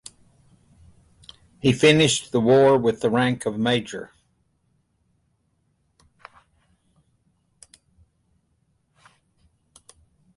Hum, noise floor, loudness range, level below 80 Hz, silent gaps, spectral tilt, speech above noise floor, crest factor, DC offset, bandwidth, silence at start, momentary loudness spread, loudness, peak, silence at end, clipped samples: none; -69 dBFS; 11 LU; -58 dBFS; none; -5 dB/octave; 50 dB; 20 dB; under 0.1%; 11.5 kHz; 1.65 s; 20 LU; -19 LUFS; -4 dBFS; 6.3 s; under 0.1%